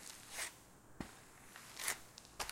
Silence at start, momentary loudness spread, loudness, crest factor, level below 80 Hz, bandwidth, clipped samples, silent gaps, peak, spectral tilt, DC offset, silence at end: 0 s; 16 LU; -46 LUFS; 30 dB; -68 dBFS; 16.5 kHz; under 0.1%; none; -18 dBFS; -1 dB/octave; under 0.1%; 0 s